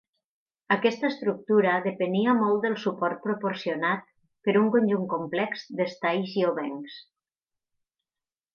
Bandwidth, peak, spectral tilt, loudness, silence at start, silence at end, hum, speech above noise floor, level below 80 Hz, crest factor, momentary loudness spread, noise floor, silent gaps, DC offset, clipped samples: 7 kHz; -8 dBFS; -7 dB/octave; -26 LUFS; 0.7 s; 1.55 s; none; over 64 dB; -78 dBFS; 18 dB; 9 LU; under -90 dBFS; none; under 0.1%; under 0.1%